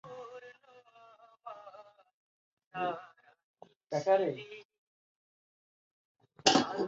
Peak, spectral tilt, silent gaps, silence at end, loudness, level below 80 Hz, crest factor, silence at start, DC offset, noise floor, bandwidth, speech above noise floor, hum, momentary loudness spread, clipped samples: -10 dBFS; -2 dB/octave; 2.14-2.57 s, 2.66-2.71 s, 3.44-3.54 s, 3.76-3.80 s, 4.65-4.69 s, 4.78-6.15 s; 0 s; -31 LUFS; -76 dBFS; 28 dB; 0.05 s; under 0.1%; -61 dBFS; 7.6 kHz; 29 dB; none; 25 LU; under 0.1%